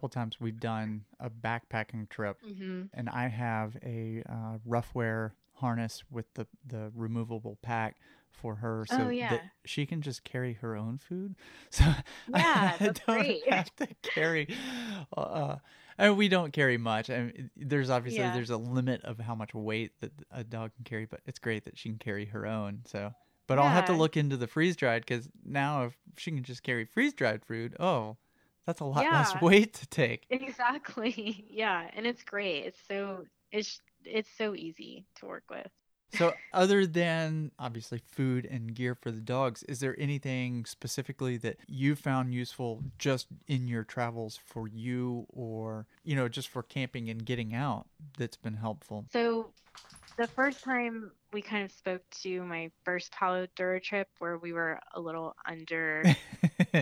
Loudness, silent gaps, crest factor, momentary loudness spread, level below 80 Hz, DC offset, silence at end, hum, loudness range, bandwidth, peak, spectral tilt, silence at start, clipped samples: -32 LUFS; none; 24 dB; 15 LU; -50 dBFS; under 0.1%; 0 s; none; 8 LU; 15.5 kHz; -10 dBFS; -6 dB/octave; 0 s; under 0.1%